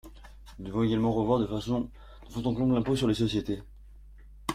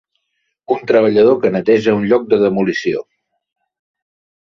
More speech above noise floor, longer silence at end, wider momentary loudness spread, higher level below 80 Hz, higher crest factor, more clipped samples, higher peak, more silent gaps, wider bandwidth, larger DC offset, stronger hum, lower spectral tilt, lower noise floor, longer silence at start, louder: second, 22 dB vs 57 dB; second, 0 s vs 1.4 s; about the same, 12 LU vs 10 LU; first, -48 dBFS vs -56 dBFS; about the same, 16 dB vs 14 dB; neither; second, -12 dBFS vs -2 dBFS; neither; first, 15 kHz vs 7 kHz; neither; neither; about the same, -7 dB/octave vs -7 dB/octave; second, -49 dBFS vs -70 dBFS; second, 0.05 s vs 0.7 s; second, -29 LUFS vs -14 LUFS